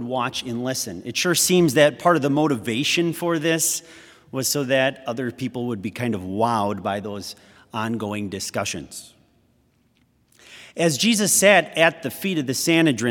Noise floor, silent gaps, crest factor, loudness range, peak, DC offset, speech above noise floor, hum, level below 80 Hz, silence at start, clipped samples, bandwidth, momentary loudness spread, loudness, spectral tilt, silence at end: -62 dBFS; none; 22 dB; 10 LU; 0 dBFS; under 0.1%; 41 dB; none; -64 dBFS; 0 s; under 0.1%; 18 kHz; 12 LU; -21 LUFS; -3.5 dB/octave; 0 s